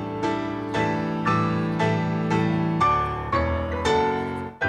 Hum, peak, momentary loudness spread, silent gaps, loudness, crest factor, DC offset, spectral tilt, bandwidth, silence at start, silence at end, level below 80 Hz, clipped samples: none; -8 dBFS; 5 LU; none; -24 LUFS; 16 dB; under 0.1%; -7 dB/octave; 9.6 kHz; 0 s; 0 s; -44 dBFS; under 0.1%